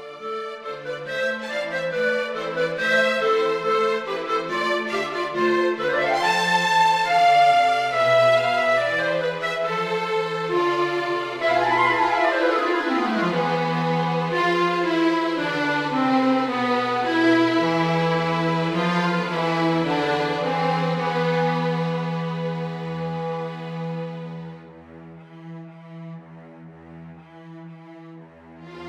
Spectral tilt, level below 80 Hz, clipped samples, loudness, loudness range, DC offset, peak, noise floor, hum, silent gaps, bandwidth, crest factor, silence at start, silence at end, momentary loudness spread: -5.5 dB/octave; -64 dBFS; under 0.1%; -21 LUFS; 15 LU; under 0.1%; -6 dBFS; -44 dBFS; none; none; 15 kHz; 16 dB; 0 s; 0 s; 14 LU